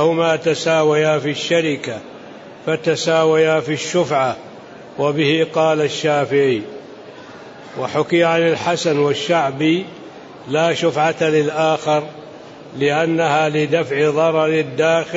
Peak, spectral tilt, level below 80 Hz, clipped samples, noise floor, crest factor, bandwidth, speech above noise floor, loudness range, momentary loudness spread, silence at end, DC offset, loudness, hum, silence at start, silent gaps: -4 dBFS; -5 dB/octave; -64 dBFS; under 0.1%; -37 dBFS; 14 dB; 8 kHz; 20 dB; 2 LU; 21 LU; 0 s; under 0.1%; -17 LUFS; none; 0 s; none